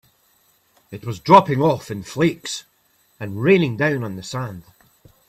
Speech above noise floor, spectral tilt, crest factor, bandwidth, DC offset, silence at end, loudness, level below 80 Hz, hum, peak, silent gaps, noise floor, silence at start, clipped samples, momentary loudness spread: 42 dB; -6 dB/octave; 20 dB; 15 kHz; under 0.1%; 0.7 s; -19 LUFS; -58 dBFS; none; 0 dBFS; none; -61 dBFS; 0.9 s; under 0.1%; 20 LU